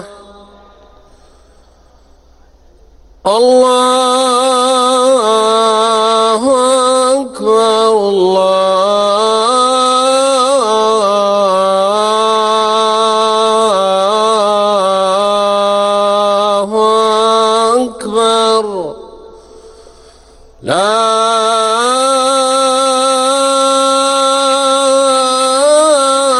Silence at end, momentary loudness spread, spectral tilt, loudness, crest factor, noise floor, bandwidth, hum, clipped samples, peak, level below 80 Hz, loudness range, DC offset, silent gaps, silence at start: 0 s; 2 LU; -2.5 dB/octave; -10 LUFS; 12 dB; -45 dBFS; 13.5 kHz; none; under 0.1%; 0 dBFS; -50 dBFS; 5 LU; under 0.1%; none; 0 s